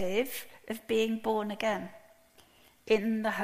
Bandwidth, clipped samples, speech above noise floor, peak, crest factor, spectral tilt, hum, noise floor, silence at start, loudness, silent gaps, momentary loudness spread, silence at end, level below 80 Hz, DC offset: 15.5 kHz; under 0.1%; 31 dB; -14 dBFS; 18 dB; -4.5 dB/octave; none; -61 dBFS; 0 s; -32 LUFS; none; 13 LU; 0 s; -66 dBFS; under 0.1%